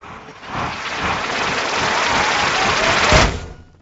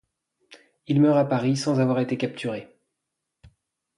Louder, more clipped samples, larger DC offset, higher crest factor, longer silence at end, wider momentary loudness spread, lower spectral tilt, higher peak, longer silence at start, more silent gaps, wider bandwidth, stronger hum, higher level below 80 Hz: first, -17 LUFS vs -23 LUFS; neither; neither; about the same, 18 dB vs 16 dB; second, 0.2 s vs 1.35 s; first, 17 LU vs 12 LU; second, -3 dB/octave vs -7 dB/octave; first, 0 dBFS vs -10 dBFS; second, 0 s vs 0.5 s; neither; second, 8.6 kHz vs 11.5 kHz; neither; first, -30 dBFS vs -66 dBFS